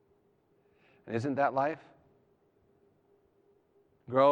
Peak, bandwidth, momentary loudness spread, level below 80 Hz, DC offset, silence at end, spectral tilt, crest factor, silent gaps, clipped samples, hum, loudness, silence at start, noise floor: -12 dBFS; 8.6 kHz; 10 LU; -82 dBFS; under 0.1%; 0 s; -7.5 dB/octave; 22 dB; none; under 0.1%; none; -32 LUFS; 1.05 s; -70 dBFS